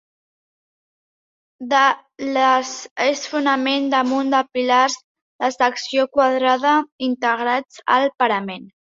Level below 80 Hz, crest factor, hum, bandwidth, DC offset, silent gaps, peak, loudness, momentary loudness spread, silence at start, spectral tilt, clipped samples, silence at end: -68 dBFS; 18 dB; none; 7.8 kHz; under 0.1%; 2.91-2.96 s, 5.04-5.15 s, 5.22-5.39 s, 6.92-6.99 s; -2 dBFS; -19 LUFS; 8 LU; 1.6 s; -2.5 dB/octave; under 0.1%; 0.2 s